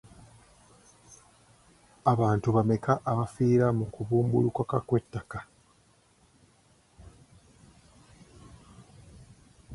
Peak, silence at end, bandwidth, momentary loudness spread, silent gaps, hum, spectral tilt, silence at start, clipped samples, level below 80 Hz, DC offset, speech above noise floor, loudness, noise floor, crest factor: -8 dBFS; 0 s; 11.5 kHz; 10 LU; none; none; -8.5 dB/octave; 2.05 s; under 0.1%; -56 dBFS; under 0.1%; 37 dB; -27 LUFS; -64 dBFS; 22 dB